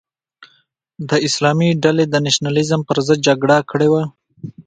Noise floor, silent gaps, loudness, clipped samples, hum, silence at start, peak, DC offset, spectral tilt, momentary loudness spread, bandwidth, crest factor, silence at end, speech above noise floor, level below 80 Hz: -60 dBFS; none; -15 LUFS; under 0.1%; none; 0.4 s; 0 dBFS; under 0.1%; -5 dB/octave; 9 LU; 9.4 kHz; 16 dB; 0.05 s; 45 dB; -56 dBFS